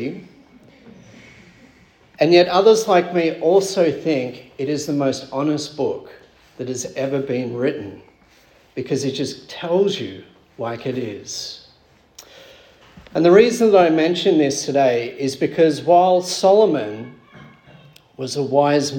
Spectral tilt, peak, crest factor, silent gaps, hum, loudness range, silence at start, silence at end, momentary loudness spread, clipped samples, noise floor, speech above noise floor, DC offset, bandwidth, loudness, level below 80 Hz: -5 dB/octave; -2 dBFS; 18 dB; none; none; 9 LU; 0 s; 0 s; 17 LU; under 0.1%; -54 dBFS; 36 dB; under 0.1%; 17.5 kHz; -18 LUFS; -62 dBFS